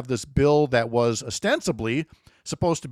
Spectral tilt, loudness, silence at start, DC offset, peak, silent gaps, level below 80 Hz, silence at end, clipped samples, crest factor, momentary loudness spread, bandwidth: -5 dB/octave; -23 LUFS; 0 s; under 0.1%; -8 dBFS; none; -44 dBFS; 0 s; under 0.1%; 16 dB; 12 LU; 14 kHz